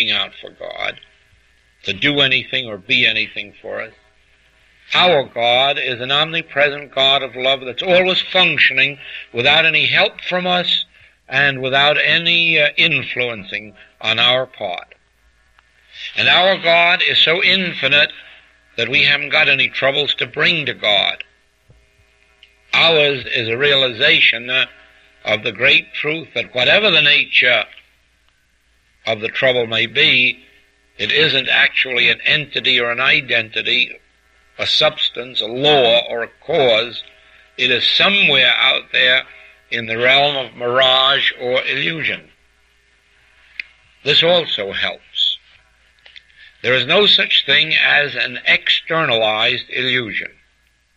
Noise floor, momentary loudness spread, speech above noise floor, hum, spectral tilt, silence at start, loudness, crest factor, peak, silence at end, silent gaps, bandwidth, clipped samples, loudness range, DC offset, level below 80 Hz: -59 dBFS; 14 LU; 43 dB; none; -4 dB/octave; 0 s; -14 LUFS; 16 dB; 0 dBFS; 0.7 s; none; 8.6 kHz; under 0.1%; 5 LU; under 0.1%; -56 dBFS